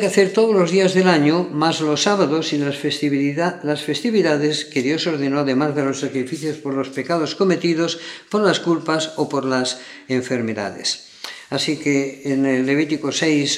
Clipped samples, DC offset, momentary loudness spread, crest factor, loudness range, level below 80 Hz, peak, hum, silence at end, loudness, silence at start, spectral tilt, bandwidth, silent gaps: under 0.1%; under 0.1%; 9 LU; 18 dB; 4 LU; -72 dBFS; 0 dBFS; none; 0 s; -19 LUFS; 0 s; -4.5 dB/octave; 13 kHz; none